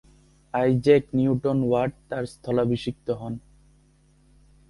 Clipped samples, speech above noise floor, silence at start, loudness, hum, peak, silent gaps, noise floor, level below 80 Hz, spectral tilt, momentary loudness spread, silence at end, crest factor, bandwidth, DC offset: under 0.1%; 36 dB; 0.55 s; -24 LUFS; none; -6 dBFS; none; -59 dBFS; -54 dBFS; -8 dB/octave; 13 LU; 1.3 s; 20 dB; 11.5 kHz; under 0.1%